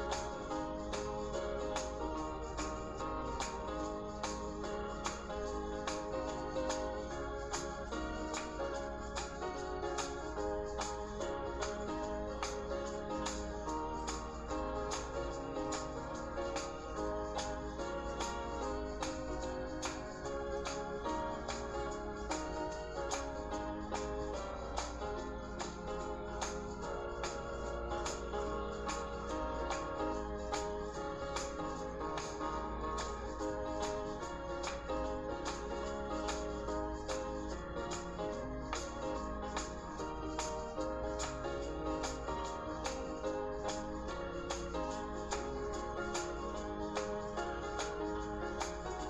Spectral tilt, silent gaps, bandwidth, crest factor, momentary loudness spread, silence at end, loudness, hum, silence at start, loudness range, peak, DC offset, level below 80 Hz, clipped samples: -4.5 dB/octave; none; 12 kHz; 18 dB; 3 LU; 0 s; -41 LUFS; none; 0 s; 1 LU; -22 dBFS; under 0.1%; -48 dBFS; under 0.1%